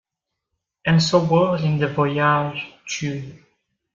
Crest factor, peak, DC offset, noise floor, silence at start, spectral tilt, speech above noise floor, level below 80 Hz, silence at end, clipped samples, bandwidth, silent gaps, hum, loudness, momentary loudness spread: 18 dB; -4 dBFS; under 0.1%; -82 dBFS; 0.85 s; -5.5 dB/octave; 63 dB; -56 dBFS; 0.55 s; under 0.1%; 7.6 kHz; none; none; -20 LUFS; 13 LU